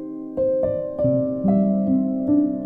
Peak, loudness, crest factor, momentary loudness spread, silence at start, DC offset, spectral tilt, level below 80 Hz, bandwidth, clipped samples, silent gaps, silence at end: -8 dBFS; -21 LUFS; 14 dB; 5 LU; 0 s; under 0.1%; -13.5 dB/octave; -50 dBFS; 2.1 kHz; under 0.1%; none; 0 s